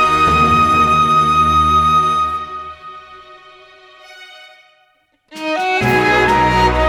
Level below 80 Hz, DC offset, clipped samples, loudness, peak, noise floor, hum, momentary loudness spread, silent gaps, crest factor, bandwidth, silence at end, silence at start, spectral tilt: -32 dBFS; under 0.1%; under 0.1%; -12 LUFS; -2 dBFS; -58 dBFS; none; 16 LU; none; 14 dB; 18 kHz; 0 s; 0 s; -5 dB/octave